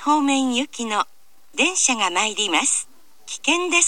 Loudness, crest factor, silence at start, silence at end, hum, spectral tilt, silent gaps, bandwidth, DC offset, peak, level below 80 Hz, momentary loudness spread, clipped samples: -20 LUFS; 20 dB; 0 s; 0 s; none; 0 dB/octave; none; 16 kHz; 0.6%; -2 dBFS; -72 dBFS; 12 LU; under 0.1%